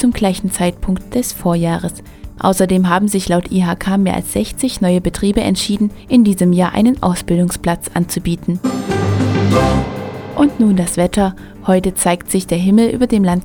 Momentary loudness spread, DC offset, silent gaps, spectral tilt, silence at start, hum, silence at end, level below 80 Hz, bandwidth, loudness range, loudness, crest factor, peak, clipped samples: 7 LU; under 0.1%; none; -6 dB/octave; 0 s; none; 0 s; -32 dBFS; 18.5 kHz; 2 LU; -15 LUFS; 14 dB; 0 dBFS; under 0.1%